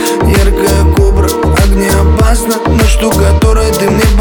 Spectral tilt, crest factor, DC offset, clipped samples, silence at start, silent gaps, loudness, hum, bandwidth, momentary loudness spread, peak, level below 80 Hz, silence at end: -5.5 dB/octave; 8 dB; under 0.1%; under 0.1%; 0 s; none; -9 LUFS; none; 20 kHz; 2 LU; 0 dBFS; -10 dBFS; 0 s